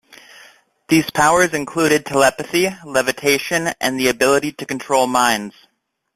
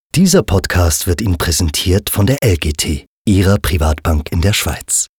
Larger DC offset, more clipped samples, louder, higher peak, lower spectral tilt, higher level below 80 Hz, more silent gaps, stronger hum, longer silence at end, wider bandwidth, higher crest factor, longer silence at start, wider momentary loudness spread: second, under 0.1% vs 0.4%; neither; second, -17 LUFS vs -14 LUFS; about the same, -2 dBFS vs -2 dBFS; about the same, -3.5 dB/octave vs -4.5 dB/octave; second, -54 dBFS vs -26 dBFS; second, none vs 3.07-3.25 s; neither; first, 0.65 s vs 0.1 s; second, 16 kHz vs over 20 kHz; about the same, 16 dB vs 12 dB; first, 0.9 s vs 0.15 s; about the same, 6 LU vs 5 LU